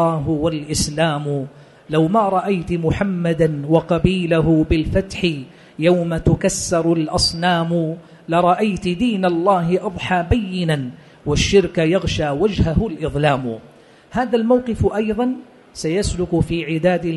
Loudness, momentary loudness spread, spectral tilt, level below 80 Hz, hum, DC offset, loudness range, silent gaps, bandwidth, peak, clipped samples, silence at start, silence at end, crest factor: -18 LUFS; 7 LU; -5.5 dB/octave; -34 dBFS; none; under 0.1%; 2 LU; none; 11.5 kHz; -2 dBFS; under 0.1%; 0 s; 0 s; 16 dB